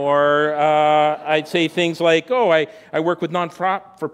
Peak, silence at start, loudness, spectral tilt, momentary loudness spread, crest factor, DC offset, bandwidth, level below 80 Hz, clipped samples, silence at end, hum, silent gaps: -2 dBFS; 0 s; -18 LUFS; -5.5 dB/octave; 7 LU; 16 dB; under 0.1%; 13 kHz; -64 dBFS; under 0.1%; 0.05 s; none; none